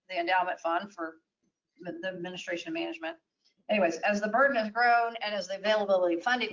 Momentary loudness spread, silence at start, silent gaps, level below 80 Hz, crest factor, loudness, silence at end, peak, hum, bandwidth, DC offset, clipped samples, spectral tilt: 14 LU; 0.1 s; none; -78 dBFS; 16 dB; -29 LUFS; 0 s; -14 dBFS; none; 7.6 kHz; under 0.1%; under 0.1%; -4 dB/octave